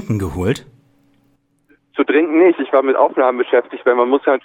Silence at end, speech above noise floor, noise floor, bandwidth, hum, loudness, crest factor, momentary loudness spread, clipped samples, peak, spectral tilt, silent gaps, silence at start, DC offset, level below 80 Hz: 0.05 s; 45 dB; -60 dBFS; 15 kHz; none; -15 LUFS; 16 dB; 8 LU; under 0.1%; 0 dBFS; -7 dB/octave; none; 0 s; under 0.1%; -46 dBFS